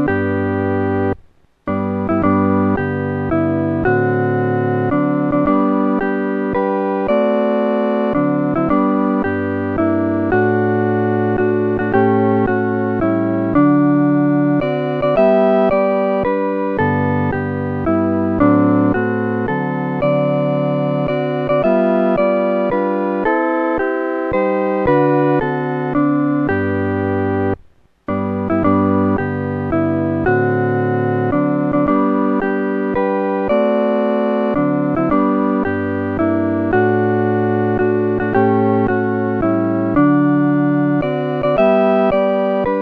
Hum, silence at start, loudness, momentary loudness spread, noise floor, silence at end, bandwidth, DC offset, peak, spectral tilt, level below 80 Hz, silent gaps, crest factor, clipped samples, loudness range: none; 0 s; -16 LUFS; 5 LU; -47 dBFS; 0 s; 4.9 kHz; under 0.1%; 0 dBFS; -10.5 dB/octave; -42 dBFS; none; 16 dB; under 0.1%; 2 LU